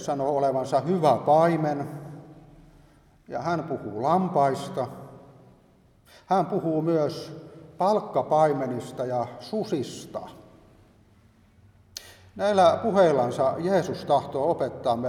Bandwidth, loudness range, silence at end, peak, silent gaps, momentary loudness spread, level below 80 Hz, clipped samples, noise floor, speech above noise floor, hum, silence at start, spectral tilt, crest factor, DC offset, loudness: 14.5 kHz; 6 LU; 0 s; -8 dBFS; none; 19 LU; -64 dBFS; under 0.1%; -58 dBFS; 34 dB; none; 0 s; -6.5 dB/octave; 18 dB; under 0.1%; -25 LUFS